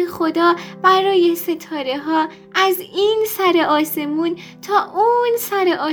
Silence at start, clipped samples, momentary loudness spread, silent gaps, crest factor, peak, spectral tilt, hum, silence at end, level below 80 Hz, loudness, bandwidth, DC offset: 0 s; under 0.1%; 8 LU; none; 16 dB; 0 dBFS; -3.5 dB/octave; none; 0 s; -64 dBFS; -17 LUFS; over 20 kHz; under 0.1%